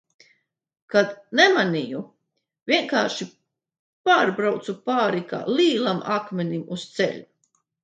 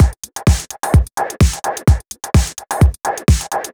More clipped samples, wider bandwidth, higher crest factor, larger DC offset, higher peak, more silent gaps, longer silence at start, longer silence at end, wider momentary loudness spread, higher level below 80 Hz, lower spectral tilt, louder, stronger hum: neither; second, 9.2 kHz vs over 20 kHz; first, 22 dB vs 14 dB; neither; about the same, -2 dBFS vs 0 dBFS; first, 2.62-2.66 s, 3.79-4.04 s vs none; first, 0.9 s vs 0 s; first, 0.6 s vs 0.05 s; first, 14 LU vs 4 LU; second, -74 dBFS vs -18 dBFS; about the same, -4.5 dB/octave vs -5.5 dB/octave; second, -22 LUFS vs -17 LUFS; neither